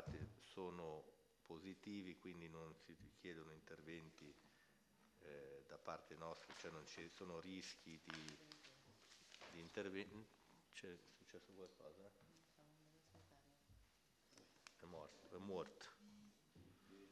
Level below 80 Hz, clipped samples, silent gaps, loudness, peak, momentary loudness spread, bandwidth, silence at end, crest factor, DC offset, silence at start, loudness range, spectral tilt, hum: -78 dBFS; under 0.1%; none; -57 LUFS; -34 dBFS; 14 LU; 12.5 kHz; 0 s; 24 dB; under 0.1%; 0 s; 10 LU; -4.5 dB/octave; none